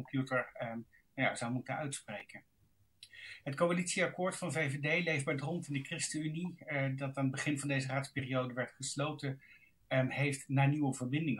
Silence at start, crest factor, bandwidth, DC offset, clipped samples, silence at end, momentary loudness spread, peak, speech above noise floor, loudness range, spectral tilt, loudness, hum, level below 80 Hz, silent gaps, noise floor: 0 s; 18 dB; 12 kHz; under 0.1%; under 0.1%; 0 s; 13 LU; -18 dBFS; 31 dB; 4 LU; -5 dB/octave; -36 LUFS; none; -76 dBFS; none; -67 dBFS